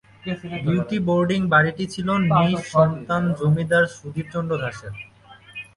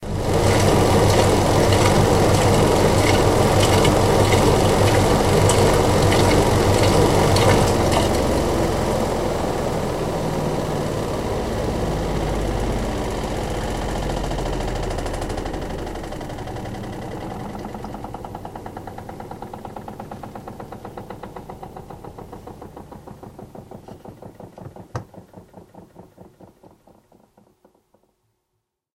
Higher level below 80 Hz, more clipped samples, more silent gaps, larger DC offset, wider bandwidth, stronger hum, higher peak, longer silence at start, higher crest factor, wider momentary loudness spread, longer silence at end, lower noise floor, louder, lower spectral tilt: second, -52 dBFS vs -30 dBFS; neither; neither; neither; second, 11.5 kHz vs 16 kHz; neither; about the same, -4 dBFS vs -2 dBFS; first, 0.25 s vs 0 s; about the same, 18 dB vs 18 dB; second, 17 LU vs 22 LU; second, 0.15 s vs 2.7 s; second, -48 dBFS vs -77 dBFS; about the same, -21 LUFS vs -19 LUFS; first, -7 dB/octave vs -5.5 dB/octave